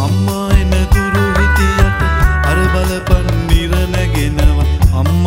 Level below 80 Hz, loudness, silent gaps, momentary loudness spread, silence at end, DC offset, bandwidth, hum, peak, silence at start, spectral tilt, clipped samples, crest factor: -14 dBFS; -13 LUFS; none; 3 LU; 0 s; under 0.1%; 16.5 kHz; none; 0 dBFS; 0 s; -6 dB/octave; under 0.1%; 12 dB